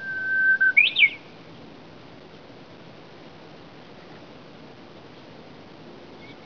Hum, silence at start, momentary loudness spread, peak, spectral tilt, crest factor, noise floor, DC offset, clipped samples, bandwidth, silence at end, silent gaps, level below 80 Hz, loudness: none; 0 s; 29 LU; -6 dBFS; -3.5 dB/octave; 22 dB; -46 dBFS; 0.2%; under 0.1%; 5.4 kHz; 0.1 s; none; -68 dBFS; -18 LUFS